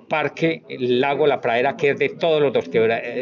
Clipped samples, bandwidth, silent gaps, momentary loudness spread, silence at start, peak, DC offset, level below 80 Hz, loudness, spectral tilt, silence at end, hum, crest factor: under 0.1%; 7 kHz; none; 5 LU; 0.1 s; -6 dBFS; under 0.1%; -68 dBFS; -20 LUFS; -6.5 dB/octave; 0 s; none; 14 dB